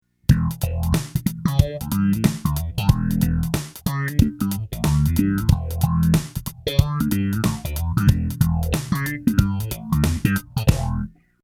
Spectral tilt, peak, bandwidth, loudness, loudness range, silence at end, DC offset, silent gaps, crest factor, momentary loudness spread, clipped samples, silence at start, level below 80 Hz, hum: -6.5 dB/octave; 0 dBFS; 17.5 kHz; -22 LUFS; 1 LU; 0.35 s; under 0.1%; none; 20 dB; 6 LU; under 0.1%; 0.3 s; -30 dBFS; none